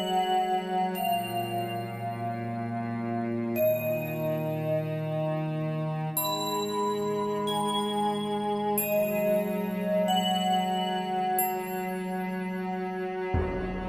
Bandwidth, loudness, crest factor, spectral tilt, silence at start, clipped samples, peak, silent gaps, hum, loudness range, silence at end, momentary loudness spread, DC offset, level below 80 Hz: 16 kHz; -29 LUFS; 14 dB; -5 dB/octave; 0 s; under 0.1%; -14 dBFS; none; none; 3 LU; 0 s; 6 LU; under 0.1%; -50 dBFS